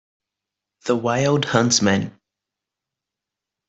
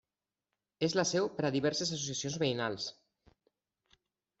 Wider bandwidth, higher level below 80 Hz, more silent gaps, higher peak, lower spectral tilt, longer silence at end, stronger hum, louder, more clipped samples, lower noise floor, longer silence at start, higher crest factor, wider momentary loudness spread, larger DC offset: about the same, 8.2 kHz vs 8.2 kHz; first, -60 dBFS vs -72 dBFS; neither; first, -2 dBFS vs -18 dBFS; about the same, -4 dB/octave vs -4 dB/octave; about the same, 1.6 s vs 1.5 s; neither; first, -19 LUFS vs -33 LUFS; neither; second, -86 dBFS vs under -90 dBFS; about the same, 0.85 s vs 0.8 s; about the same, 22 dB vs 18 dB; first, 12 LU vs 6 LU; neither